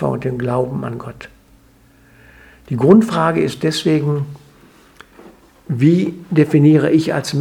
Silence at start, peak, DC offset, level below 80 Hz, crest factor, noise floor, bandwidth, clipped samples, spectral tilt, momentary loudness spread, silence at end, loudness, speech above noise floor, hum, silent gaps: 0 s; 0 dBFS; under 0.1%; -52 dBFS; 16 dB; -50 dBFS; 14.5 kHz; under 0.1%; -7 dB/octave; 15 LU; 0 s; -15 LUFS; 35 dB; none; none